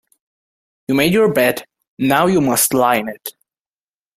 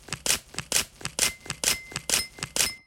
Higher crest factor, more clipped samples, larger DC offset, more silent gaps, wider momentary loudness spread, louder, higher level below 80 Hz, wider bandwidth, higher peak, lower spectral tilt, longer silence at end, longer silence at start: second, 18 dB vs 26 dB; neither; neither; first, 1.88-1.97 s vs none; first, 16 LU vs 3 LU; first, -15 LUFS vs -26 LUFS; about the same, -54 dBFS vs -52 dBFS; about the same, 16 kHz vs 17 kHz; first, 0 dBFS vs -4 dBFS; first, -4 dB/octave vs 0 dB/octave; first, 0.85 s vs 0.1 s; first, 0.9 s vs 0.1 s